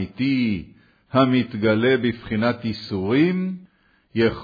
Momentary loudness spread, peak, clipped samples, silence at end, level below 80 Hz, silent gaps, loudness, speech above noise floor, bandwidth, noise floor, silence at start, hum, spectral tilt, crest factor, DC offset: 10 LU; -4 dBFS; under 0.1%; 0 s; -52 dBFS; none; -22 LUFS; 35 dB; 5 kHz; -55 dBFS; 0 s; none; -8.5 dB/octave; 16 dB; under 0.1%